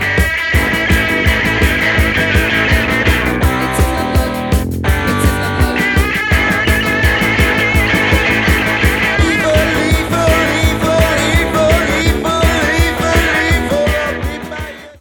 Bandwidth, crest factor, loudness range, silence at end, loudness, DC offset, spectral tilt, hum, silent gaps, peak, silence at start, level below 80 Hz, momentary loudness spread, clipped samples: 19 kHz; 12 dB; 2 LU; 0.1 s; -13 LUFS; under 0.1%; -5 dB/octave; none; none; 0 dBFS; 0 s; -20 dBFS; 4 LU; under 0.1%